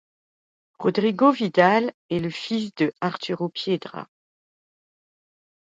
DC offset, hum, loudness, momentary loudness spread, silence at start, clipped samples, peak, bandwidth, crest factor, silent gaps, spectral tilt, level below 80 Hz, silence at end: under 0.1%; none; -23 LUFS; 10 LU; 0.8 s; under 0.1%; -4 dBFS; 7.8 kHz; 22 dB; 1.94-2.09 s; -6.5 dB/octave; -68 dBFS; 1.55 s